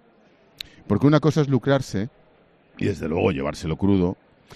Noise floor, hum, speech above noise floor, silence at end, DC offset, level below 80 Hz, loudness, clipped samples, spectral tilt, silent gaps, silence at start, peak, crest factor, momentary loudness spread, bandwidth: -57 dBFS; none; 36 dB; 0.4 s; under 0.1%; -50 dBFS; -22 LUFS; under 0.1%; -7.5 dB/octave; none; 0.9 s; -2 dBFS; 20 dB; 18 LU; 13.5 kHz